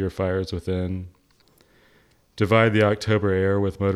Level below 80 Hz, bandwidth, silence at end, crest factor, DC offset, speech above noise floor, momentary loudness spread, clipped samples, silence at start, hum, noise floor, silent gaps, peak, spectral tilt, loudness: -50 dBFS; 12.5 kHz; 0 s; 20 dB; under 0.1%; 38 dB; 11 LU; under 0.1%; 0 s; none; -59 dBFS; none; -2 dBFS; -7 dB/octave; -22 LUFS